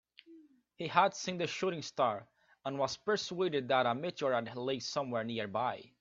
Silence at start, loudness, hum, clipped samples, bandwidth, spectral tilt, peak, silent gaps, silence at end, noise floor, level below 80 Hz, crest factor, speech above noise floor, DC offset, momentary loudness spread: 0.3 s; -34 LUFS; none; under 0.1%; 7.8 kHz; -4.5 dB/octave; -12 dBFS; none; 0.15 s; -60 dBFS; -78 dBFS; 24 dB; 26 dB; under 0.1%; 7 LU